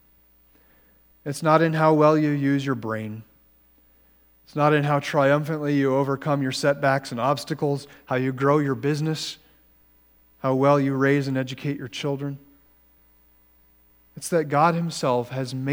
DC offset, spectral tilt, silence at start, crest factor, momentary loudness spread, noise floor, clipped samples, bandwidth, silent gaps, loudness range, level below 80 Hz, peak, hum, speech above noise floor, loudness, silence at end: under 0.1%; -6.5 dB/octave; 1.25 s; 20 dB; 12 LU; -58 dBFS; under 0.1%; 17 kHz; none; 5 LU; -64 dBFS; -4 dBFS; none; 36 dB; -23 LUFS; 0 s